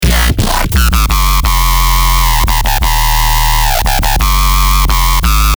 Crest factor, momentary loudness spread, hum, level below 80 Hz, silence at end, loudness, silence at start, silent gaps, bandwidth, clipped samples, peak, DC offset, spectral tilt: 8 dB; 1 LU; none; -10 dBFS; 0.05 s; -11 LUFS; 0 s; none; over 20 kHz; under 0.1%; 0 dBFS; under 0.1%; -3 dB/octave